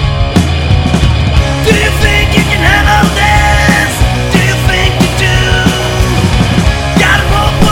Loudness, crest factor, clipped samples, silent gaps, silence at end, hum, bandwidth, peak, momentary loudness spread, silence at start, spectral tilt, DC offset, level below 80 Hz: -9 LUFS; 8 dB; 2%; none; 0 s; none; 17 kHz; 0 dBFS; 3 LU; 0 s; -5 dB/octave; under 0.1%; -14 dBFS